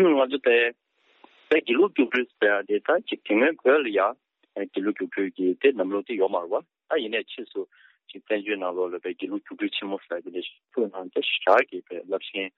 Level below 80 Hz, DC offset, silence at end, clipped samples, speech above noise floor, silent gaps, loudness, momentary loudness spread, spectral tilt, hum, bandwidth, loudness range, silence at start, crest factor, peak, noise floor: -80 dBFS; under 0.1%; 0.1 s; under 0.1%; 33 dB; none; -25 LUFS; 13 LU; -1.5 dB/octave; none; 5.6 kHz; 7 LU; 0 s; 18 dB; -6 dBFS; -58 dBFS